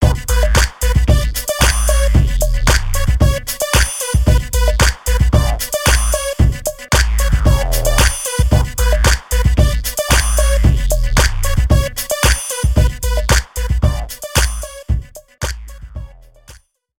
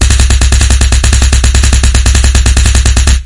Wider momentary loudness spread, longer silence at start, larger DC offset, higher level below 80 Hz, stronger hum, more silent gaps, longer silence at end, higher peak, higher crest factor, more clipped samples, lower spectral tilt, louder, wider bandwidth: first, 7 LU vs 0 LU; about the same, 0 s vs 0 s; neither; second, -16 dBFS vs -8 dBFS; neither; neither; first, 0.45 s vs 0 s; about the same, 0 dBFS vs 0 dBFS; first, 14 dB vs 6 dB; second, under 0.1% vs 2%; about the same, -4 dB/octave vs -3.5 dB/octave; second, -15 LUFS vs -8 LUFS; first, 18 kHz vs 11.5 kHz